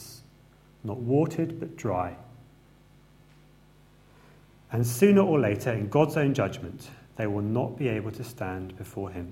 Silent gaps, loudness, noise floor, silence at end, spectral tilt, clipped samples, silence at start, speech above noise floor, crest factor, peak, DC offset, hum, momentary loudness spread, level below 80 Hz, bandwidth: none; -27 LUFS; -57 dBFS; 0 s; -7 dB/octave; under 0.1%; 0 s; 30 dB; 22 dB; -6 dBFS; under 0.1%; none; 18 LU; -60 dBFS; 16.5 kHz